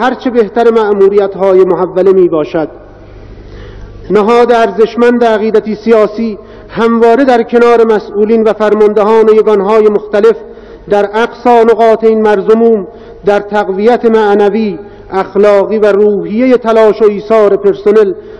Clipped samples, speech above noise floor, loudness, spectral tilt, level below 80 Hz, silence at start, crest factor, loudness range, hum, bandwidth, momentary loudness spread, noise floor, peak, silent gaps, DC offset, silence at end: 6%; 23 dB; -8 LUFS; -7 dB/octave; -40 dBFS; 0 s; 8 dB; 3 LU; none; 8.2 kHz; 7 LU; -30 dBFS; 0 dBFS; none; under 0.1%; 0.05 s